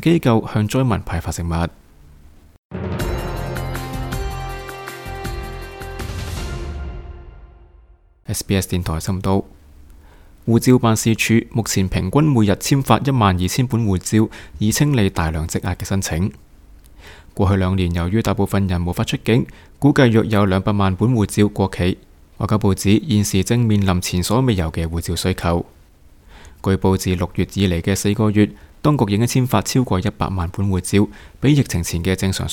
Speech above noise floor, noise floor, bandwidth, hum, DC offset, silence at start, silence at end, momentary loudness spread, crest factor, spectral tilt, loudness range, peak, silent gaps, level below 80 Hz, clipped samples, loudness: 32 dB; -49 dBFS; 18 kHz; none; under 0.1%; 0 s; 0 s; 13 LU; 18 dB; -6 dB/octave; 10 LU; 0 dBFS; 2.58-2.70 s; -34 dBFS; under 0.1%; -19 LUFS